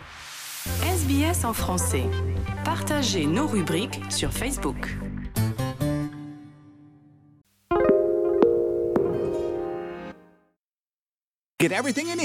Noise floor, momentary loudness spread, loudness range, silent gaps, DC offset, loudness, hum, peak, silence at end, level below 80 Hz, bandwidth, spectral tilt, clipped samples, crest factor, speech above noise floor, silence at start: under -90 dBFS; 13 LU; 5 LU; 10.58-11.57 s; under 0.1%; -25 LUFS; none; -4 dBFS; 0 s; -42 dBFS; 16 kHz; -5 dB/octave; under 0.1%; 22 dB; over 65 dB; 0 s